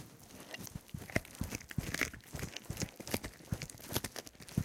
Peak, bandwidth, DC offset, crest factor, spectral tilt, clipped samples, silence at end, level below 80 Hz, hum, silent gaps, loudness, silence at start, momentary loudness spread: -14 dBFS; 17 kHz; under 0.1%; 28 dB; -4 dB/octave; under 0.1%; 0 s; -54 dBFS; none; none; -41 LUFS; 0 s; 10 LU